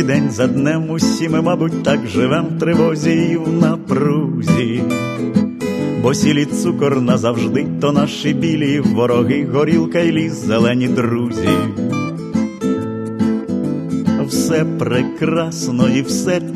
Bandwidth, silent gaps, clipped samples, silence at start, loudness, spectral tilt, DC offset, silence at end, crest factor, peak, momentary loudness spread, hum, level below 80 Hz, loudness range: 13 kHz; none; under 0.1%; 0 s; -16 LUFS; -6 dB/octave; under 0.1%; 0 s; 16 dB; 0 dBFS; 5 LU; none; -54 dBFS; 3 LU